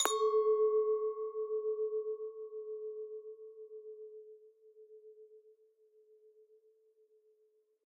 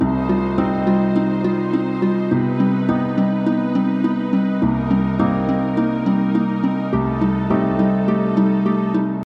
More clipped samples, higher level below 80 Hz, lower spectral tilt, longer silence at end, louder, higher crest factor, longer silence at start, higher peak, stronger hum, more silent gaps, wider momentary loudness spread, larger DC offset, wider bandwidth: neither; second, under -90 dBFS vs -40 dBFS; second, 2.5 dB/octave vs -10 dB/octave; first, 2.45 s vs 0 s; second, -35 LUFS vs -19 LUFS; first, 28 dB vs 14 dB; about the same, 0 s vs 0 s; second, -10 dBFS vs -4 dBFS; neither; neither; first, 25 LU vs 3 LU; neither; first, 7.2 kHz vs 5.6 kHz